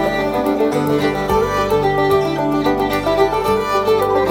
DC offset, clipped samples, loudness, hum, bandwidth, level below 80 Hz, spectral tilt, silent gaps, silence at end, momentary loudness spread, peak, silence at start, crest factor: under 0.1%; under 0.1%; -16 LUFS; none; 17 kHz; -36 dBFS; -6 dB/octave; none; 0 s; 2 LU; -2 dBFS; 0 s; 14 dB